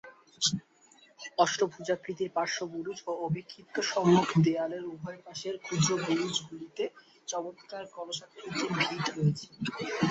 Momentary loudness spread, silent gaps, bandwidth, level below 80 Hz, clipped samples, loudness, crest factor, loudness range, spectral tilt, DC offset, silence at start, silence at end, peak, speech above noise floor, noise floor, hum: 13 LU; none; 8.2 kHz; -68 dBFS; under 0.1%; -31 LUFS; 22 dB; 5 LU; -4.5 dB/octave; under 0.1%; 0.05 s; 0 s; -10 dBFS; 30 dB; -61 dBFS; none